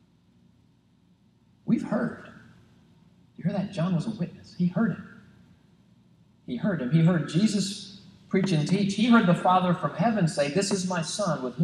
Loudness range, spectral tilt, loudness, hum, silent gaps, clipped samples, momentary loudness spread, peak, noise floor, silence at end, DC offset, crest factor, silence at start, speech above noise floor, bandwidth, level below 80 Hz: 9 LU; -6 dB/octave; -26 LUFS; none; none; under 0.1%; 13 LU; -6 dBFS; -62 dBFS; 0 s; under 0.1%; 20 dB; 1.65 s; 37 dB; 11.5 kHz; -66 dBFS